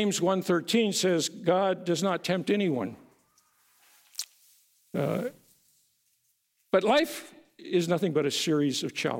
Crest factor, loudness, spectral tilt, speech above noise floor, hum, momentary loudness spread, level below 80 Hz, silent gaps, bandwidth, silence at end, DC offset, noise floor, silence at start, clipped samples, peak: 20 dB; -27 LUFS; -4.5 dB/octave; 46 dB; none; 13 LU; -76 dBFS; none; 17 kHz; 0 s; under 0.1%; -73 dBFS; 0 s; under 0.1%; -10 dBFS